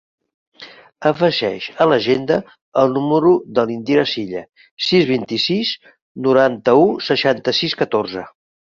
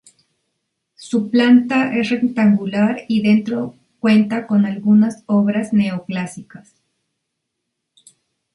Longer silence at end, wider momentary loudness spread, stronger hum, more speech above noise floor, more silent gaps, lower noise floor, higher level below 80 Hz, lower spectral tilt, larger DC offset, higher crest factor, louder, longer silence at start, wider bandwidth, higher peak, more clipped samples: second, 0.35 s vs 1.95 s; second, 9 LU vs 12 LU; neither; second, 25 dB vs 61 dB; first, 2.61-2.72 s, 4.71-4.77 s, 6.02-6.15 s vs none; second, -42 dBFS vs -77 dBFS; about the same, -58 dBFS vs -62 dBFS; about the same, -6 dB/octave vs -7 dB/octave; neither; about the same, 16 dB vs 16 dB; about the same, -17 LUFS vs -17 LUFS; second, 0.6 s vs 1 s; second, 7.4 kHz vs 11.5 kHz; about the same, -2 dBFS vs -2 dBFS; neither